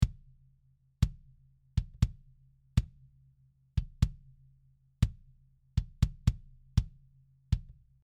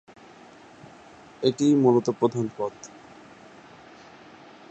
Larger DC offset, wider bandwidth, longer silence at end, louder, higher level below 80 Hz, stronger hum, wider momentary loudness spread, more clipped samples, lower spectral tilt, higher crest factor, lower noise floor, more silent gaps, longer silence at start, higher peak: neither; first, 14.5 kHz vs 8.4 kHz; second, 0.45 s vs 1.85 s; second, -35 LUFS vs -23 LUFS; first, -38 dBFS vs -68 dBFS; neither; second, 6 LU vs 17 LU; neither; about the same, -7 dB/octave vs -6.5 dB/octave; about the same, 24 dB vs 22 dB; first, -68 dBFS vs -49 dBFS; neither; second, 0 s vs 1.4 s; second, -10 dBFS vs -6 dBFS